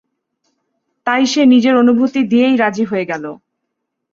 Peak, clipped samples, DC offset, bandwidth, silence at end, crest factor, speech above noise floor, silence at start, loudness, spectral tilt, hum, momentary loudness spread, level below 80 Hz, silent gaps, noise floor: -2 dBFS; under 0.1%; under 0.1%; 7.4 kHz; 0.8 s; 14 dB; 62 dB; 1.05 s; -13 LUFS; -4.5 dB/octave; none; 13 LU; -62 dBFS; none; -74 dBFS